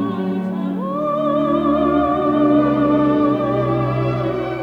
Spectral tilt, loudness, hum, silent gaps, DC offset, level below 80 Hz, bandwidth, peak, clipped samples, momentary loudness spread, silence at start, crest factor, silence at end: -9.5 dB/octave; -18 LUFS; none; none; under 0.1%; -44 dBFS; 5.6 kHz; -4 dBFS; under 0.1%; 7 LU; 0 s; 12 dB; 0 s